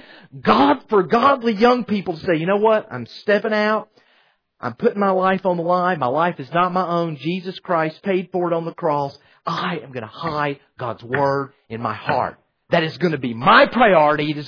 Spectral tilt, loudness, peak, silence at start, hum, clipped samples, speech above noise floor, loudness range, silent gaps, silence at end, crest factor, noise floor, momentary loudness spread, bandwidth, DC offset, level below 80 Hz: -7.5 dB/octave; -19 LUFS; -2 dBFS; 0.35 s; none; under 0.1%; 41 dB; 6 LU; none; 0 s; 18 dB; -60 dBFS; 13 LU; 5.4 kHz; under 0.1%; -56 dBFS